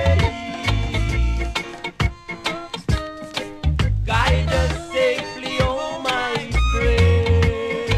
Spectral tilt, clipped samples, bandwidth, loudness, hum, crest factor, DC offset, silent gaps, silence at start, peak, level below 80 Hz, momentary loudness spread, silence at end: -5.5 dB/octave; under 0.1%; 12.5 kHz; -21 LUFS; none; 14 dB; under 0.1%; none; 0 s; -6 dBFS; -26 dBFS; 9 LU; 0 s